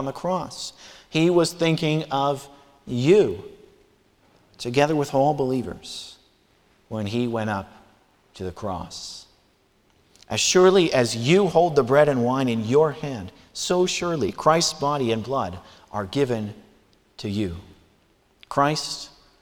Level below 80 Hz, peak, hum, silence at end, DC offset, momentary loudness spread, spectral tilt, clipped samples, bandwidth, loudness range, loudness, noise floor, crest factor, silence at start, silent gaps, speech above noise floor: -56 dBFS; -4 dBFS; none; 0.35 s; under 0.1%; 17 LU; -5 dB/octave; under 0.1%; 17.5 kHz; 11 LU; -22 LUFS; -62 dBFS; 20 dB; 0 s; none; 40 dB